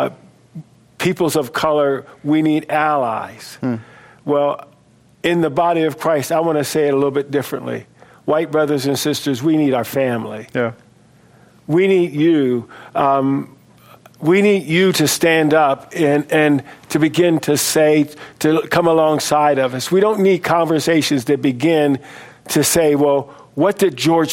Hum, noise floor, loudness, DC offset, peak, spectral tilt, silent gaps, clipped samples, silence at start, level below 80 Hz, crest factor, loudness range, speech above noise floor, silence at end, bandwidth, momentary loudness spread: none; -51 dBFS; -16 LUFS; under 0.1%; 0 dBFS; -5 dB/octave; none; under 0.1%; 0 s; -58 dBFS; 16 dB; 4 LU; 35 dB; 0 s; 16.5 kHz; 10 LU